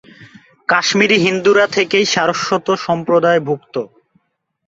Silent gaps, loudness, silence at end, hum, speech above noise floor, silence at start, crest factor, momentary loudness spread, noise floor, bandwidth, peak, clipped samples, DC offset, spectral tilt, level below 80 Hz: none; -14 LUFS; 0.8 s; none; 55 dB; 0.2 s; 16 dB; 12 LU; -69 dBFS; 7.8 kHz; 0 dBFS; under 0.1%; under 0.1%; -4 dB/octave; -58 dBFS